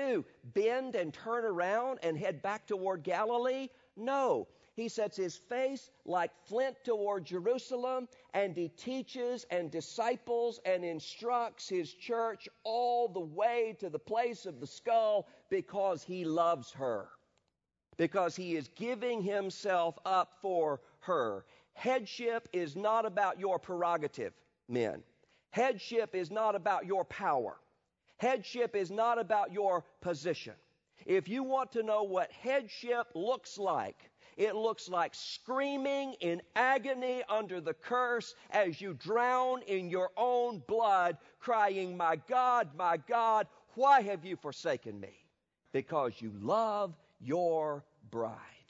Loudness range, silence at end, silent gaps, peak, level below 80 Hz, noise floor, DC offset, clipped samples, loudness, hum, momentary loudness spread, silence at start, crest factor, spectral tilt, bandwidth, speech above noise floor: 4 LU; 0.2 s; none; -14 dBFS; -82 dBFS; -86 dBFS; under 0.1%; under 0.1%; -34 LUFS; none; 9 LU; 0 s; 20 dB; -3.5 dB/octave; 7.6 kHz; 52 dB